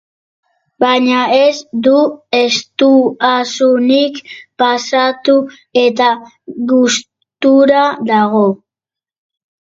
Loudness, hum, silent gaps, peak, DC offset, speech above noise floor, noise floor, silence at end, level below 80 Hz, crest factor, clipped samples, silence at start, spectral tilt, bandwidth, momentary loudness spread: -12 LUFS; none; none; 0 dBFS; under 0.1%; 76 dB; -88 dBFS; 1.15 s; -62 dBFS; 12 dB; under 0.1%; 0.8 s; -4 dB/octave; 8 kHz; 7 LU